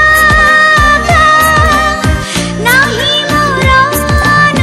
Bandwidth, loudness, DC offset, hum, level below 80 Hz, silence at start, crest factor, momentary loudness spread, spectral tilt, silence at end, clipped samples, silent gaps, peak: 15.5 kHz; -7 LUFS; 0.1%; none; -20 dBFS; 0 s; 8 dB; 7 LU; -3.5 dB/octave; 0 s; 0.5%; none; 0 dBFS